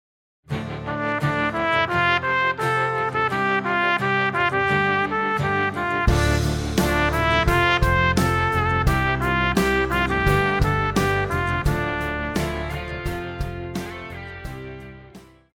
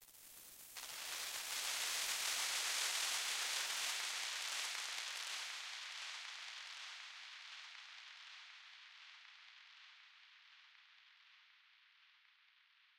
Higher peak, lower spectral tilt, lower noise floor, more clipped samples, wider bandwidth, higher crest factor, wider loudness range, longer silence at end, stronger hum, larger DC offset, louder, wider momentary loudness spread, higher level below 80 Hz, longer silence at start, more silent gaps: first, -4 dBFS vs -26 dBFS; first, -5.5 dB/octave vs 4 dB/octave; second, -46 dBFS vs -72 dBFS; neither; about the same, 17.5 kHz vs 16 kHz; about the same, 18 dB vs 20 dB; second, 7 LU vs 21 LU; second, 0.3 s vs 0.85 s; neither; neither; first, -21 LUFS vs -41 LUFS; second, 12 LU vs 22 LU; first, -32 dBFS vs -88 dBFS; first, 0.5 s vs 0 s; neither